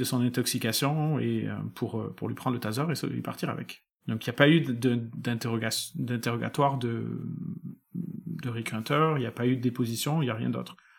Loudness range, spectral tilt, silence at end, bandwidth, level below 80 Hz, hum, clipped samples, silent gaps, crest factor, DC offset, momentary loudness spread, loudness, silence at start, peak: 4 LU; -5.5 dB/octave; 0.25 s; 18.5 kHz; -72 dBFS; none; under 0.1%; 3.91-3.98 s; 24 dB; under 0.1%; 12 LU; -29 LUFS; 0 s; -6 dBFS